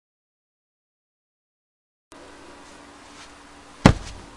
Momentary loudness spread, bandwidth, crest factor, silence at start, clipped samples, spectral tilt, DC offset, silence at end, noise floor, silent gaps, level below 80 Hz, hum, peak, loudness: 27 LU; 11.5 kHz; 28 dB; 3.85 s; under 0.1%; -6 dB/octave; under 0.1%; 0.25 s; -46 dBFS; none; -40 dBFS; none; 0 dBFS; -20 LUFS